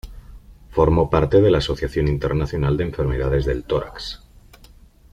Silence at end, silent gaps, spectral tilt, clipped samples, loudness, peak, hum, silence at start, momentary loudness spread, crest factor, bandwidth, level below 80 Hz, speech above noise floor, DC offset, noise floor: 0.95 s; none; -7.5 dB/octave; under 0.1%; -20 LUFS; -2 dBFS; none; 0.05 s; 13 LU; 18 dB; 13.5 kHz; -32 dBFS; 29 dB; under 0.1%; -48 dBFS